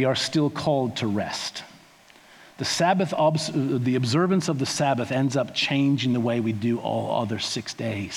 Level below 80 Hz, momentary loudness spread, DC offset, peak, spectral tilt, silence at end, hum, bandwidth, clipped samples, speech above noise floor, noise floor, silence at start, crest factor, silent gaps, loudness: -66 dBFS; 7 LU; under 0.1%; -8 dBFS; -5 dB/octave; 0 s; none; 16 kHz; under 0.1%; 29 dB; -53 dBFS; 0 s; 16 dB; none; -24 LUFS